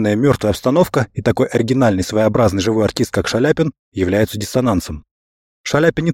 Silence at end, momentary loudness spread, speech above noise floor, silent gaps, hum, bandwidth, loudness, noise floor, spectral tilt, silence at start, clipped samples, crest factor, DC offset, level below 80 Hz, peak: 0 s; 6 LU; over 74 dB; 3.79-3.92 s, 5.11-5.64 s; none; 17 kHz; -16 LUFS; under -90 dBFS; -6 dB/octave; 0 s; under 0.1%; 16 dB; under 0.1%; -40 dBFS; 0 dBFS